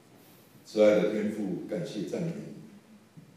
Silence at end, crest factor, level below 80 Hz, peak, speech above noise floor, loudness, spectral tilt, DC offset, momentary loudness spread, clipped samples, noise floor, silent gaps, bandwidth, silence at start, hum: 0.15 s; 20 dB; -78 dBFS; -10 dBFS; 28 dB; -29 LUFS; -6.5 dB/octave; under 0.1%; 18 LU; under 0.1%; -56 dBFS; none; 15 kHz; 0.65 s; none